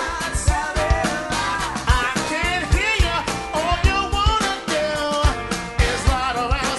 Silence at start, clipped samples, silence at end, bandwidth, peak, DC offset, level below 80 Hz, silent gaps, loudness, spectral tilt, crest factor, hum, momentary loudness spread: 0 s; under 0.1%; 0 s; 12 kHz; -2 dBFS; under 0.1%; -24 dBFS; none; -21 LUFS; -4 dB/octave; 18 dB; none; 4 LU